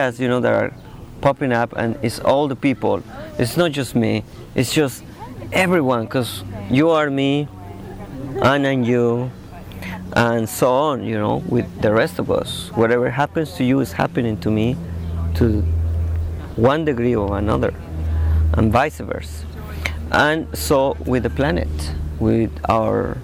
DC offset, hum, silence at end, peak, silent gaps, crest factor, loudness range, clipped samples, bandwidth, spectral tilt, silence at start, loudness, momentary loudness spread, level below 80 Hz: under 0.1%; none; 0 s; -6 dBFS; none; 14 dB; 1 LU; under 0.1%; 17.5 kHz; -6 dB/octave; 0 s; -19 LUFS; 12 LU; -30 dBFS